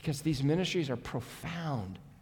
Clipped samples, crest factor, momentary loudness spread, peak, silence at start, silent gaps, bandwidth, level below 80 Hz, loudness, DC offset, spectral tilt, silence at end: under 0.1%; 16 dB; 10 LU; -18 dBFS; 0 s; none; 18.5 kHz; -56 dBFS; -34 LUFS; under 0.1%; -6 dB/octave; 0.05 s